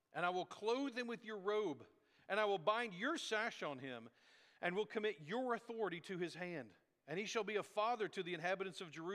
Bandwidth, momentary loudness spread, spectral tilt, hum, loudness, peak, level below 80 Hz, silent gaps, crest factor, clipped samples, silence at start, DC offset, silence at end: 13.5 kHz; 9 LU; -4 dB/octave; none; -42 LUFS; -22 dBFS; under -90 dBFS; none; 20 dB; under 0.1%; 0.15 s; under 0.1%; 0 s